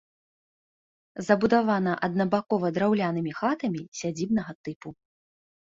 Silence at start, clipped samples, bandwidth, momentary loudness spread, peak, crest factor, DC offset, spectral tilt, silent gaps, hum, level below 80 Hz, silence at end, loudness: 1.15 s; under 0.1%; 7.8 kHz; 16 LU; -6 dBFS; 22 dB; under 0.1%; -6.5 dB/octave; 3.88-3.92 s, 4.55-4.64 s, 4.76-4.80 s; none; -64 dBFS; 0.8 s; -26 LUFS